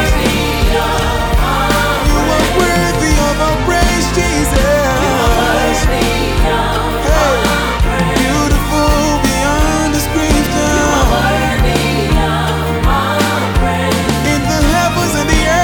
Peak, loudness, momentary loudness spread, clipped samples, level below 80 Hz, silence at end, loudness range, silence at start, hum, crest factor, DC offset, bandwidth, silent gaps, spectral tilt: 0 dBFS; -13 LUFS; 2 LU; under 0.1%; -18 dBFS; 0 s; 1 LU; 0 s; none; 12 dB; under 0.1%; over 20 kHz; none; -4.5 dB/octave